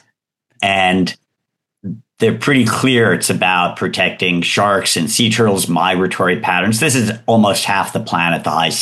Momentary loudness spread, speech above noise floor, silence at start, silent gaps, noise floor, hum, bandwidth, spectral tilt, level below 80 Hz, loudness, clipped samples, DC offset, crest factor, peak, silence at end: 5 LU; 63 dB; 0.6 s; none; -77 dBFS; none; 13 kHz; -4 dB/octave; -56 dBFS; -14 LUFS; under 0.1%; under 0.1%; 14 dB; 0 dBFS; 0 s